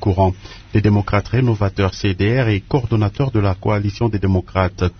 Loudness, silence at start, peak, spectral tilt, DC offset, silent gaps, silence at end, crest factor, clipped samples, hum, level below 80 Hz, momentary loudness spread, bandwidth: -18 LUFS; 0 s; -2 dBFS; -8 dB/octave; under 0.1%; none; 0.05 s; 16 dB; under 0.1%; none; -36 dBFS; 3 LU; 6.6 kHz